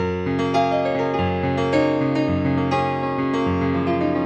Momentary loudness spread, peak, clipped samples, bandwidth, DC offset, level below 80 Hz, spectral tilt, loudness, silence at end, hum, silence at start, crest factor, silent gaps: 3 LU; -6 dBFS; under 0.1%; 8.4 kHz; under 0.1%; -46 dBFS; -7.5 dB/octave; -21 LUFS; 0 s; none; 0 s; 14 dB; none